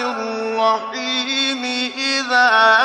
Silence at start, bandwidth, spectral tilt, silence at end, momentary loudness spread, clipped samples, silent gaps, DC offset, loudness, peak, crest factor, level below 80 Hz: 0 s; 11.5 kHz; -1 dB/octave; 0 s; 10 LU; under 0.1%; none; under 0.1%; -17 LUFS; -2 dBFS; 16 dB; -72 dBFS